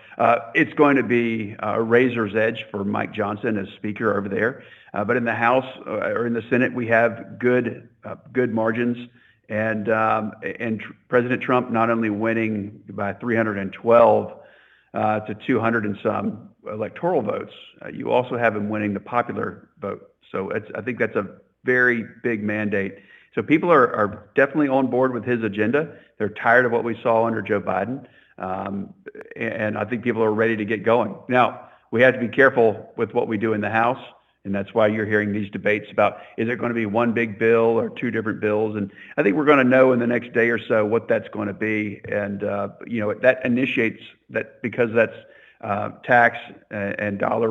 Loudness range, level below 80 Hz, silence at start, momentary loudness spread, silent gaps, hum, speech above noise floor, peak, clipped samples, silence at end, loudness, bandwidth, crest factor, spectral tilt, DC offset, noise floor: 5 LU; -68 dBFS; 0.1 s; 13 LU; none; none; 31 dB; -2 dBFS; under 0.1%; 0 s; -22 LUFS; 6.8 kHz; 20 dB; -8.5 dB/octave; under 0.1%; -53 dBFS